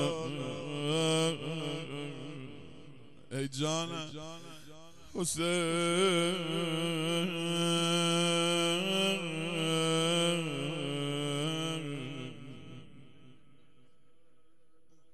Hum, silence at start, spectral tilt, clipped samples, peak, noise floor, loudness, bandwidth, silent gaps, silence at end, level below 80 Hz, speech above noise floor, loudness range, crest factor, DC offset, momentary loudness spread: none; 0 s; -4 dB/octave; under 0.1%; -16 dBFS; -72 dBFS; -32 LUFS; 13 kHz; none; 1.8 s; -70 dBFS; 40 dB; 10 LU; 16 dB; 0.3%; 18 LU